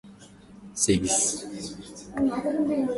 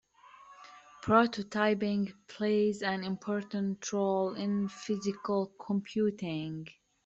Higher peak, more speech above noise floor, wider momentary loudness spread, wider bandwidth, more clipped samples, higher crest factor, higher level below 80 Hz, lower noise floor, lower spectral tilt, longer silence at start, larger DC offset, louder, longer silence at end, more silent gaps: about the same, -8 dBFS vs -10 dBFS; about the same, 23 dB vs 25 dB; first, 16 LU vs 13 LU; first, 12 kHz vs 7.8 kHz; neither; about the same, 20 dB vs 22 dB; first, -52 dBFS vs -70 dBFS; second, -49 dBFS vs -56 dBFS; second, -3.5 dB/octave vs -6 dB/octave; second, 0.05 s vs 0.25 s; neither; first, -25 LUFS vs -32 LUFS; second, 0 s vs 0.35 s; neither